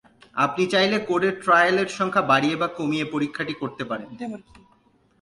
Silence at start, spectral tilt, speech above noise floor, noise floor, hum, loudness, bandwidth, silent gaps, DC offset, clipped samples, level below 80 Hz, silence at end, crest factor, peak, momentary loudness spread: 0.35 s; -5 dB/octave; 38 dB; -61 dBFS; none; -22 LUFS; 11.5 kHz; none; under 0.1%; under 0.1%; -64 dBFS; 0.85 s; 18 dB; -6 dBFS; 14 LU